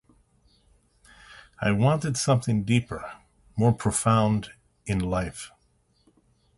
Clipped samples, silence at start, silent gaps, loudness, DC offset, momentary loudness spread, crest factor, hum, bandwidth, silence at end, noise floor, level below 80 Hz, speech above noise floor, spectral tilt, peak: under 0.1%; 1.3 s; none; -25 LUFS; under 0.1%; 19 LU; 18 dB; none; 12 kHz; 1.1 s; -66 dBFS; -48 dBFS; 42 dB; -5.5 dB/octave; -8 dBFS